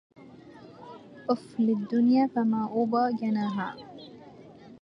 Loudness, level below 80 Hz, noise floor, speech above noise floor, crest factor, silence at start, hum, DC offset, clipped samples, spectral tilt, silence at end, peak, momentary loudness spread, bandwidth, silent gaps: -27 LUFS; -72 dBFS; -49 dBFS; 23 dB; 18 dB; 0.2 s; none; under 0.1%; under 0.1%; -8 dB/octave; 0.05 s; -10 dBFS; 23 LU; 5.8 kHz; none